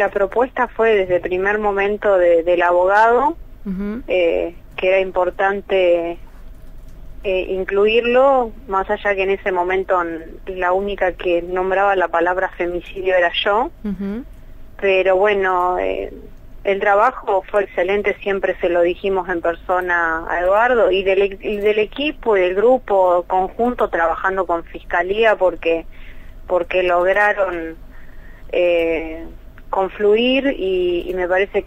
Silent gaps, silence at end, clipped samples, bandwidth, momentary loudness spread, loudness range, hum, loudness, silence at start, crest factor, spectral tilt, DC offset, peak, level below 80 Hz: none; 0 s; under 0.1%; 8 kHz; 10 LU; 3 LU; none; -17 LUFS; 0 s; 14 dB; -6 dB/octave; under 0.1%; -4 dBFS; -38 dBFS